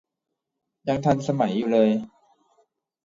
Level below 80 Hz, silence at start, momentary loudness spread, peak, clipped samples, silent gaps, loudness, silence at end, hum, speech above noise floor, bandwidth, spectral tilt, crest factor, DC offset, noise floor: -60 dBFS; 0.85 s; 11 LU; -6 dBFS; under 0.1%; none; -23 LUFS; 1 s; none; 46 dB; 7.6 kHz; -7.5 dB/octave; 20 dB; under 0.1%; -67 dBFS